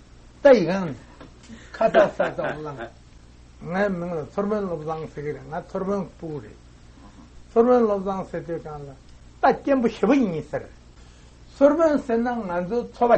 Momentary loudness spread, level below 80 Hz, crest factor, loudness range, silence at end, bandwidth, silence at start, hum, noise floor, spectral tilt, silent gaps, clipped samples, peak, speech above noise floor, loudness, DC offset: 17 LU; -50 dBFS; 20 dB; 7 LU; 0 s; 8.4 kHz; 0.4 s; none; -48 dBFS; -7 dB/octave; none; under 0.1%; -2 dBFS; 26 dB; -23 LUFS; under 0.1%